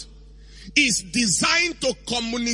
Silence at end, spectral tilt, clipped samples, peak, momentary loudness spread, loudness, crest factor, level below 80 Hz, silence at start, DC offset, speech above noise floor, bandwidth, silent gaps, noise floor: 0 s; -1.5 dB/octave; under 0.1%; -4 dBFS; 8 LU; -20 LUFS; 20 dB; -46 dBFS; 0 s; under 0.1%; 23 dB; 11.5 kHz; none; -45 dBFS